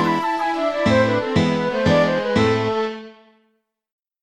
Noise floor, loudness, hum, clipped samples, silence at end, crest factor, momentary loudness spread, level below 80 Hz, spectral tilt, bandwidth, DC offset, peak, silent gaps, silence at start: -68 dBFS; -19 LUFS; none; under 0.1%; 1.1 s; 16 dB; 6 LU; -48 dBFS; -6.5 dB/octave; 12.5 kHz; 0.3%; -4 dBFS; none; 0 s